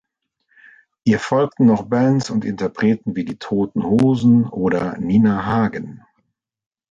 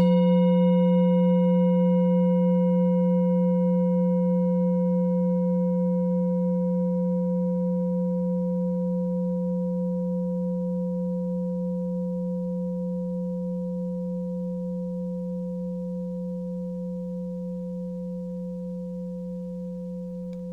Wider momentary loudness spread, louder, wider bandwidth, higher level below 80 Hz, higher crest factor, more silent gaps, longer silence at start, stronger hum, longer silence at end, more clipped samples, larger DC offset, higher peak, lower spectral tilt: second, 8 LU vs 13 LU; first, -18 LUFS vs -26 LUFS; first, 7.8 kHz vs 3.9 kHz; first, -50 dBFS vs -58 dBFS; about the same, 14 dB vs 12 dB; neither; first, 1.05 s vs 0 s; neither; first, 0.95 s vs 0 s; neither; neither; first, -4 dBFS vs -12 dBFS; second, -7.5 dB/octave vs -11.5 dB/octave